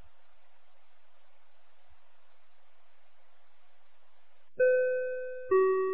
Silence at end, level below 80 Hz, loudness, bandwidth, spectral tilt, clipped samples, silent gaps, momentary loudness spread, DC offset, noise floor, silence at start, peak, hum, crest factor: 0 s; -74 dBFS; -29 LUFS; 4 kHz; -5 dB/octave; under 0.1%; none; 12 LU; 0.8%; -70 dBFS; 4.6 s; -16 dBFS; 50 Hz at -100 dBFS; 18 dB